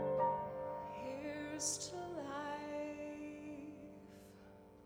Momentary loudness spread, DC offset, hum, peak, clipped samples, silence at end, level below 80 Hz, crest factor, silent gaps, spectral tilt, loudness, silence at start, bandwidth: 20 LU; under 0.1%; none; -24 dBFS; under 0.1%; 0 s; -72 dBFS; 20 dB; none; -3.5 dB/octave; -43 LUFS; 0 s; over 20 kHz